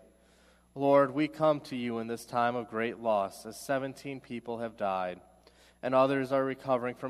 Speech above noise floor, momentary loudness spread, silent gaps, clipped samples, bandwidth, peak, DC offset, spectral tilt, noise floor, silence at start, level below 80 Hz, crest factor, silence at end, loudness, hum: 32 dB; 14 LU; none; under 0.1%; 15 kHz; -12 dBFS; under 0.1%; -6 dB/octave; -63 dBFS; 0.75 s; -70 dBFS; 20 dB; 0 s; -31 LUFS; 60 Hz at -65 dBFS